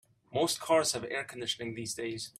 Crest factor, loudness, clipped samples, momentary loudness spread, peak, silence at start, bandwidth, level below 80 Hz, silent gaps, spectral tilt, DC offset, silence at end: 20 dB; -32 LUFS; under 0.1%; 9 LU; -14 dBFS; 0.3 s; 15.5 kHz; -70 dBFS; none; -3 dB/octave; under 0.1%; 0.1 s